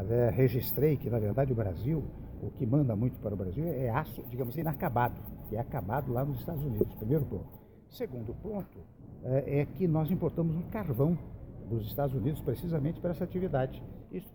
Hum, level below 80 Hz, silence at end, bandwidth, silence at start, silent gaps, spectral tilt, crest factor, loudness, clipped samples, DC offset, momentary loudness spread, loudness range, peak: none; -48 dBFS; 0 s; 17 kHz; 0 s; none; -9.5 dB/octave; 20 dB; -32 LUFS; under 0.1%; under 0.1%; 13 LU; 3 LU; -12 dBFS